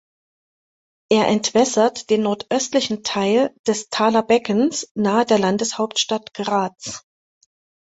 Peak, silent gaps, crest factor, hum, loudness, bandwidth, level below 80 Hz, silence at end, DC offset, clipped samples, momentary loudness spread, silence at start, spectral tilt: -2 dBFS; 3.59-3.64 s, 4.91-4.95 s; 18 dB; none; -19 LUFS; 8.2 kHz; -62 dBFS; 0.85 s; under 0.1%; under 0.1%; 6 LU; 1.1 s; -3.5 dB/octave